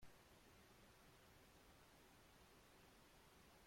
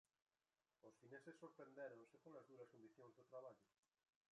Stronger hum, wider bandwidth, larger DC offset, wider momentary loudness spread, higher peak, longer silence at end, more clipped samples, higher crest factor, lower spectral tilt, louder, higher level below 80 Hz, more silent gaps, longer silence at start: neither; first, 16.5 kHz vs 10 kHz; neither; second, 0 LU vs 8 LU; second, -52 dBFS vs -44 dBFS; second, 0 s vs 0.65 s; neither; about the same, 16 dB vs 20 dB; second, -3.5 dB/octave vs -6 dB/octave; second, -69 LUFS vs -63 LUFS; first, -78 dBFS vs under -90 dBFS; neither; second, 0 s vs 0.85 s